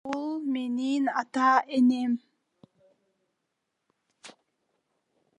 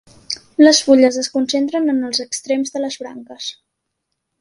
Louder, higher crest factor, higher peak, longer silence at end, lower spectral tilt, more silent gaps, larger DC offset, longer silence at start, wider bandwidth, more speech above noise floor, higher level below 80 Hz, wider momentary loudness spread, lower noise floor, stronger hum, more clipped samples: second, -26 LUFS vs -16 LUFS; about the same, 20 dB vs 18 dB; second, -10 dBFS vs 0 dBFS; first, 1.1 s vs 0.9 s; first, -4.5 dB/octave vs -2 dB/octave; neither; neither; second, 0.05 s vs 0.3 s; second, 9.4 kHz vs 11.5 kHz; about the same, 57 dB vs 59 dB; second, -84 dBFS vs -62 dBFS; second, 8 LU vs 18 LU; first, -81 dBFS vs -75 dBFS; neither; neither